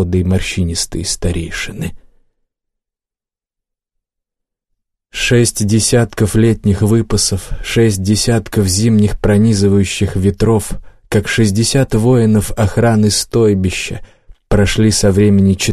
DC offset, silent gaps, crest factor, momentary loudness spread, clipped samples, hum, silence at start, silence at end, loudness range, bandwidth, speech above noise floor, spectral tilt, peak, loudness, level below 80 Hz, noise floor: under 0.1%; none; 12 dB; 9 LU; under 0.1%; none; 0 s; 0 s; 9 LU; 13 kHz; 76 dB; -5 dB/octave; -2 dBFS; -13 LUFS; -30 dBFS; -89 dBFS